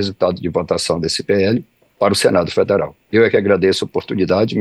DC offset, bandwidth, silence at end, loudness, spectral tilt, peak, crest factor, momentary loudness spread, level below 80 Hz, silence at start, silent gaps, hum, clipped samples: under 0.1%; 12.5 kHz; 0 s; -16 LUFS; -5 dB/octave; -2 dBFS; 14 dB; 6 LU; -48 dBFS; 0 s; none; none; under 0.1%